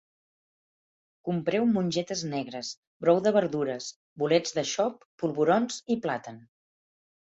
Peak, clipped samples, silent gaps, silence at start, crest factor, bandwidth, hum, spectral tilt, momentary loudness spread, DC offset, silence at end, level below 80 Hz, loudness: -10 dBFS; under 0.1%; 2.77-3.00 s, 3.96-4.16 s, 5.05-5.18 s; 1.25 s; 20 dB; 8 kHz; none; -5 dB/octave; 12 LU; under 0.1%; 1 s; -70 dBFS; -28 LUFS